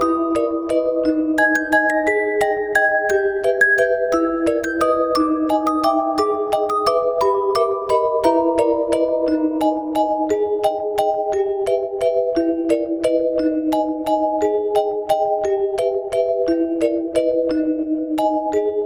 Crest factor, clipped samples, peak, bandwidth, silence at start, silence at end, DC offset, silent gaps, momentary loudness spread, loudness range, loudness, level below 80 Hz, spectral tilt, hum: 16 dB; under 0.1%; -4 dBFS; over 20 kHz; 0 s; 0 s; under 0.1%; none; 4 LU; 3 LU; -19 LUFS; -52 dBFS; -4.5 dB/octave; none